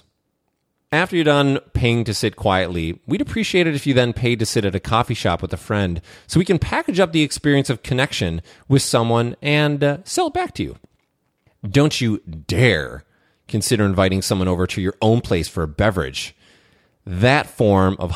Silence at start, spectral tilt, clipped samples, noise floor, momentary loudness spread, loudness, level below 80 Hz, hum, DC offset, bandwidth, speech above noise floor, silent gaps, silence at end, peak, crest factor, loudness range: 0.9 s; -5.5 dB/octave; under 0.1%; -71 dBFS; 9 LU; -19 LUFS; -40 dBFS; none; under 0.1%; 16 kHz; 53 dB; none; 0 s; -2 dBFS; 18 dB; 2 LU